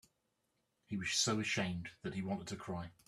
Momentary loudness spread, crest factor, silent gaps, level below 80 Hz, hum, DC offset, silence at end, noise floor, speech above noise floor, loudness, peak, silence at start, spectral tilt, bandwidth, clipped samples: 11 LU; 18 dB; none; -70 dBFS; none; under 0.1%; 0.15 s; -83 dBFS; 43 dB; -38 LUFS; -22 dBFS; 0.9 s; -3.5 dB/octave; 13.5 kHz; under 0.1%